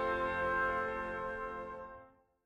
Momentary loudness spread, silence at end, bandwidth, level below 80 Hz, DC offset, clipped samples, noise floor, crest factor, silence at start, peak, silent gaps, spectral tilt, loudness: 16 LU; 0.35 s; 10.5 kHz; -58 dBFS; under 0.1%; under 0.1%; -59 dBFS; 14 dB; 0 s; -24 dBFS; none; -6 dB/octave; -36 LUFS